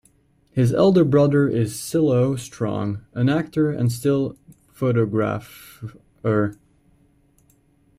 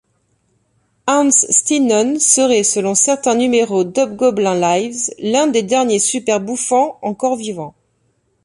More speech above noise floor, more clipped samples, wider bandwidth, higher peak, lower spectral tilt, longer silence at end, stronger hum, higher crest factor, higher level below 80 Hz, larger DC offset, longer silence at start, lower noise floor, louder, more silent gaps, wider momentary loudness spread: second, 40 dB vs 48 dB; neither; first, 16 kHz vs 11.5 kHz; second, -6 dBFS vs 0 dBFS; first, -7.5 dB/octave vs -3 dB/octave; first, 1.45 s vs 0.75 s; neither; about the same, 16 dB vs 16 dB; first, -54 dBFS vs -60 dBFS; neither; second, 0.55 s vs 1.05 s; about the same, -60 dBFS vs -63 dBFS; second, -21 LUFS vs -14 LUFS; neither; first, 13 LU vs 9 LU